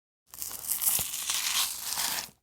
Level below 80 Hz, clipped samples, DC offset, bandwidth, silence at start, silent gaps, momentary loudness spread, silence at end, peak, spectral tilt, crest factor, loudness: -64 dBFS; under 0.1%; under 0.1%; over 20 kHz; 0.35 s; none; 10 LU; 0.15 s; -4 dBFS; 1.5 dB/octave; 28 dB; -28 LUFS